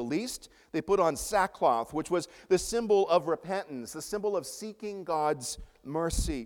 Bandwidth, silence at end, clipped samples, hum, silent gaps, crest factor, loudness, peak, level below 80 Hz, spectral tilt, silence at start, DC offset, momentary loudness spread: 18 kHz; 0 s; under 0.1%; none; none; 18 dB; -30 LUFS; -12 dBFS; -46 dBFS; -4.5 dB/octave; 0 s; under 0.1%; 12 LU